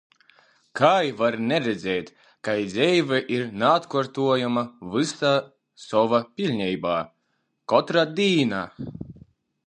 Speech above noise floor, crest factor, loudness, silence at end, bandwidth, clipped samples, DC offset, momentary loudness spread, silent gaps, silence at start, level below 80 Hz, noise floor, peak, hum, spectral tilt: 51 dB; 22 dB; -23 LUFS; 0.55 s; 9.8 kHz; under 0.1%; under 0.1%; 14 LU; none; 0.75 s; -62 dBFS; -73 dBFS; -2 dBFS; none; -5.5 dB/octave